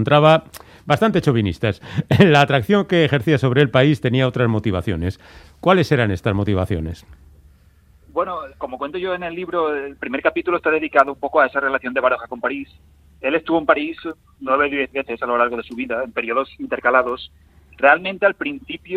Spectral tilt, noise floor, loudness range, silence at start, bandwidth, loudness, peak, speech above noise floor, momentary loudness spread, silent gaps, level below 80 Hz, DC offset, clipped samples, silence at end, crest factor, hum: -7 dB/octave; -52 dBFS; 8 LU; 0 s; 15 kHz; -19 LUFS; 0 dBFS; 33 dB; 12 LU; none; -48 dBFS; under 0.1%; under 0.1%; 0 s; 18 dB; none